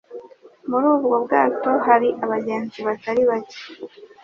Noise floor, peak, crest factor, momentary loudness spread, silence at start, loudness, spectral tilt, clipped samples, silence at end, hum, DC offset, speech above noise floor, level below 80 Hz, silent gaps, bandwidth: -44 dBFS; -2 dBFS; 18 dB; 20 LU; 0.1 s; -20 LUFS; -6.5 dB/octave; under 0.1%; 0.2 s; none; under 0.1%; 24 dB; -66 dBFS; none; 6.8 kHz